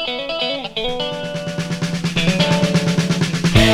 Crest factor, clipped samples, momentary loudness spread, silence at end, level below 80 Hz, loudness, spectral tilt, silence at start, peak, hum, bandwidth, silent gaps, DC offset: 18 dB; under 0.1%; 8 LU; 0 s; -34 dBFS; -19 LUFS; -5 dB/octave; 0 s; 0 dBFS; none; 15 kHz; none; under 0.1%